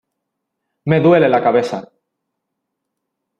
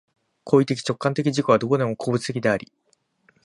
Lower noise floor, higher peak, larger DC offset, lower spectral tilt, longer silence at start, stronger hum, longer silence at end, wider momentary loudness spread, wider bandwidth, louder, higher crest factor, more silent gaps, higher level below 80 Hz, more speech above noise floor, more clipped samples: first, -77 dBFS vs -63 dBFS; about the same, -2 dBFS vs -4 dBFS; neither; first, -8 dB/octave vs -6 dB/octave; first, 0.85 s vs 0.45 s; neither; first, 1.55 s vs 0.85 s; first, 16 LU vs 5 LU; second, 9 kHz vs 11.5 kHz; first, -14 LUFS vs -22 LUFS; about the same, 16 dB vs 20 dB; neither; about the same, -60 dBFS vs -62 dBFS; first, 64 dB vs 42 dB; neither